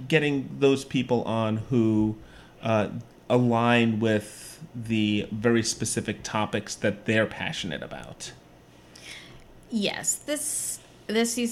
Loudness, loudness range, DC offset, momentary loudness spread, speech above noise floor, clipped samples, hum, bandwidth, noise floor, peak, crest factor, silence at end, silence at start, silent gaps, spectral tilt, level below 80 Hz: -26 LUFS; 6 LU; under 0.1%; 17 LU; 27 dB; under 0.1%; none; 16 kHz; -52 dBFS; -6 dBFS; 20 dB; 0 s; 0 s; none; -4.5 dB/octave; -56 dBFS